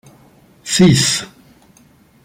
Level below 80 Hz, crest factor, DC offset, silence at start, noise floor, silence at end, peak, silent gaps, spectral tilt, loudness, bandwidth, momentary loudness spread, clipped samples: -46 dBFS; 16 dB; under 0.1%; 0.65 s; -50 dBFS; 1 s; -2 dBFS; none; -4 dB/octave; -13 LUFS; 16 kHz; 23 LU; under 0.1%